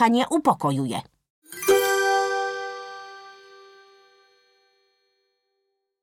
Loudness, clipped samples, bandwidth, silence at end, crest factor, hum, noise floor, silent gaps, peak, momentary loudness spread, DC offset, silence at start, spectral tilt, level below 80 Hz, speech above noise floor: -23 LUFS; under 0.1%; 16.5 kHz; 2.7 s; 20 dB; none; -77 dBFS; 1.30-1.42 s; -6 dBFS; 22 LU; under 0.1%; 0 s; -4 dB/octave; -70 dBFS; 55 dB